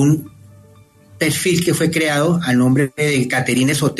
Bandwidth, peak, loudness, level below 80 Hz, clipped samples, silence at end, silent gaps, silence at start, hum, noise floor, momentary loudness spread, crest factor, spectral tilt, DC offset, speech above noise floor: 13 kHz; -4 dBFS; -16 LUFS; -52 dBFS; under 0.1%; 0 s; none; 0 s; none; -47 dBFS; 3 LU; 14 dB; -5 dB/octave; under 0.1%; 31 dB